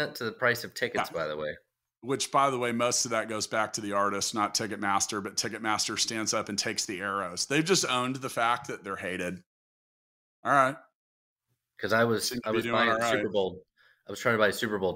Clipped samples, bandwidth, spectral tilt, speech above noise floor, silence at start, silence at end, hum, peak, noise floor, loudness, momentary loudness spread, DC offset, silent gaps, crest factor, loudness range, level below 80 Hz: under 0.1%; 16 kHz; -3 dB/octave; over 61 dB; 0 s; 0 s; none; -8 dBFS; under -90 dBFS; -28 LUFS; 10 LU; under 0.1%; 9.46-10.43 s, 10.95-11.36 s; 22 dB; 3 LU; -68 dBFS